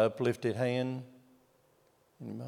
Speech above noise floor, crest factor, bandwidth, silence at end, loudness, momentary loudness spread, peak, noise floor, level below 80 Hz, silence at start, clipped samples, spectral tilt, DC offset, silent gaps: 36 dB; 20 dB; 15.5 kHz; 0 s; -33 LUFS; 17 LU; -14 dBFS; -69 dBFS; -82 dBFS; 0 s; under 0.1%; -7 dB/octave; under 0.1%; none